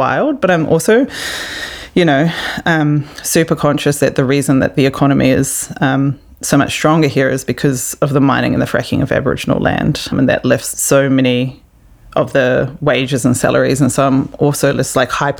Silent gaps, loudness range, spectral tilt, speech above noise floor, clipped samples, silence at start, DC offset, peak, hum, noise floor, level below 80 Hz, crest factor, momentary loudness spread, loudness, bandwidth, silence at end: none; 1 LU; -5 dB/octave; 29 dB; under 0.1%; 0 s; under 0.1%; 0 dBFS; none; -43 dBFS; -40 dBFS; 12 dB; 5 LU; -14 LUFS; over 20 kHz; 0 s